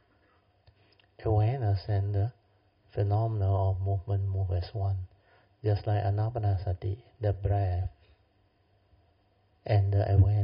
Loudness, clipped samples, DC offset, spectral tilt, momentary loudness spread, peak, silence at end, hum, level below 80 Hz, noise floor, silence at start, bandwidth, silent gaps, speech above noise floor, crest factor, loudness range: -30 LUFS; under 0.1%; under 0.1%; -8.5 dB/octave; 9 LU; -12 dBFS; 0 s; none; -48 dBFS; -68 dBFS; 1.2 s; 5.4 kHz; none; 40 dB; 16 dB; 3 LU